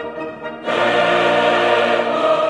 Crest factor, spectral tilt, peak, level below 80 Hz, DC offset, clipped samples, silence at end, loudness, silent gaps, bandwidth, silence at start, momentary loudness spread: 14 dB; -4.5 dB/octave; -2 dBFS; -58 dBFS; under 0.1%; under 0.1%; 0 s; -16 LUFS; none; 11.5 kHz; 0 s; 13 LU